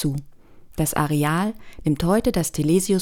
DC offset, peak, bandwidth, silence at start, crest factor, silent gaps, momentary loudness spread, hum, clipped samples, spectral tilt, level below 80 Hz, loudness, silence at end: under 0.1%; -6 dBFS; 18 kHz; 0 s; 16 dB; none; 8 LU; none; under 0.1%; -5.5 dB/octave; -40 dBFS; -22 LUFS; 0 s